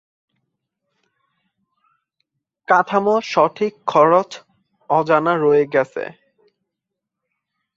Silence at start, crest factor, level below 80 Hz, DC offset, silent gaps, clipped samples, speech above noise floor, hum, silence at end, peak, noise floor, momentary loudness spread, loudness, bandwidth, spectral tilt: 2.7 s; 20 dB; -68 dBFS; under 0.1%; none; under 0.1%; 65 dB; none; 1.7 s; 0 dBFS; -81 dBFS; 16 LU; -17 LUFS; 7.6 kHz; -6 dB/octave